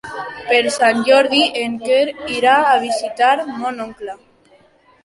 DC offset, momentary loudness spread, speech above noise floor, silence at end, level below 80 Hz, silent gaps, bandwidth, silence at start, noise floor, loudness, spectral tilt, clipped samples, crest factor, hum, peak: under 0.1%; 16 LU; 36 dB; 0.9 s; -58 dBFS; none; 11.5 kHz; 0.05 s; -52 dBFS; -15 LUFS; -2.5 dB/octave; under 0.1%; 16 dB; none; -2 dBFS